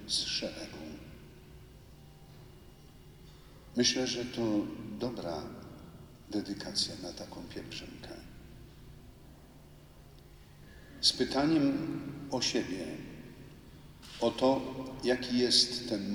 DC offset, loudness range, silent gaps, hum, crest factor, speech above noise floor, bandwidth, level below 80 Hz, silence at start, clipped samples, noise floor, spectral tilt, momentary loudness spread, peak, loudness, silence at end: under 0.1%; 15 LU; none; none; 22 dB; 22 dB; over 20 kHz; -58 dBFS; 0 s; under 0.1%; -55 dBFS; -3.5 dB/octave; 26 LU; -12 dBFS; -32 LUFS; 0 s